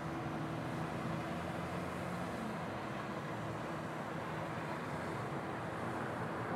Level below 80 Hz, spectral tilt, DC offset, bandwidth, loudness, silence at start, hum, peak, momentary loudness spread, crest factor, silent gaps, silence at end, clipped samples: -64 dBFS; -6.5 dB/octave; under 0.1%; 16 kHz; -41 LUFS; 0 s; none; -28 dBFS; 2 LU; 12 dB; none; 0 s; under 0.1%